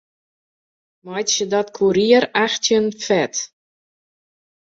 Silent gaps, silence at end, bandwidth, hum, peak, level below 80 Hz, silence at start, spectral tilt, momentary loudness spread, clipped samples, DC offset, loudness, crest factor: none; 1.2 s; 7.8 kHz; none; -2 dBFS; -62 dBFS; 1.05 s; -3 dB/octave; 11 LU; under 0.1%; under 0.1%; -18 LUFS; 20 dB